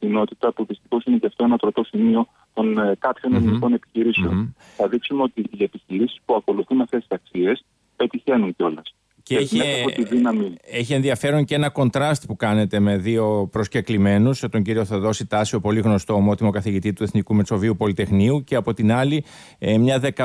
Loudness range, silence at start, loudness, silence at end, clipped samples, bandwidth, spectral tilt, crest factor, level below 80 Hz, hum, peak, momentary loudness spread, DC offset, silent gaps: 3 LU; 0 s; -21 LUFS; 0 s; under 0.1%; 11 kHz; -6.5 dB/octave; 12 dB; -52 dBFS; none; -8 dBFS; 6 LU; under 0.1%; none